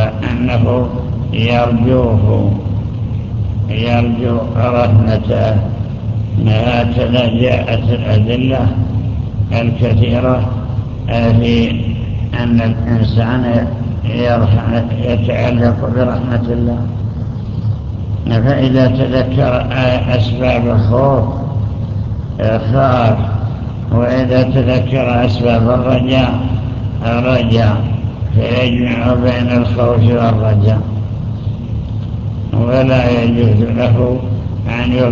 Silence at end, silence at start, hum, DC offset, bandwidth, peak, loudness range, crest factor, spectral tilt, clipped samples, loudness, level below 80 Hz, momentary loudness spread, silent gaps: 0 s; 0 s; none; under 0.1%; 6.6 kHz; 0 dBFS; 2 LU; 12 dB; -9 dB/octave; under 0.1%; -14 LUFS; -26 dBFS; 8 LU; none